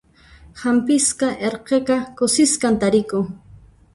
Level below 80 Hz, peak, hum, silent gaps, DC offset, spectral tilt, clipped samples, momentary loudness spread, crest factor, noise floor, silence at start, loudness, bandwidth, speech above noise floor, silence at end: -52 dBFS; -4 dBFS; none; none; under 0.1%; -3.5 dB/octave; under 0.1%; 9 LU; 16 dB; -47 dBFS; 0.55 s; -19 LUFS; 11.5 kHz; 29 dB; 0.55 s